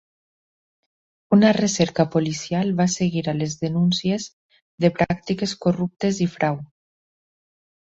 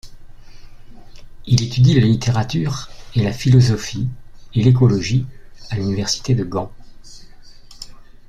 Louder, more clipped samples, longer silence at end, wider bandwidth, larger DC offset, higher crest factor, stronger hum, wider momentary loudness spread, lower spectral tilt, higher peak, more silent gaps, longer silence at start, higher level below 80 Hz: second, -21 LUFS vs -18 LUFS; neither; first, 1.15 s vs 0.25 s; second, 8 kHz vs 9.2 kHz; neither; about the same, 20 dB vs 18 dB; neither; second, 8 LU vs 20 LU; about the same, -5.5 dB/octave vs -6 dB/octave; about the same, -4 dBFS vs -2 dBFS; first, 4.33-4.49 s, 4.62-4.78 s vs none; first, 1.3 s vs 0.05 s; second, -56 dBFS vs -40 dBFS